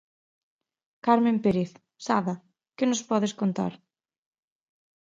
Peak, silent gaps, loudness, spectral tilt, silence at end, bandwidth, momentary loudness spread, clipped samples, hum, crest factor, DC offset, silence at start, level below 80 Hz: -6 dBFS; none; -26 LUFS; -5.5 dB/octave; 1.35 s; 7.8 kHz; 12 LU; under 0.1%; none; 22 dB; under 0.1%; 1.05 s; -66 dBFS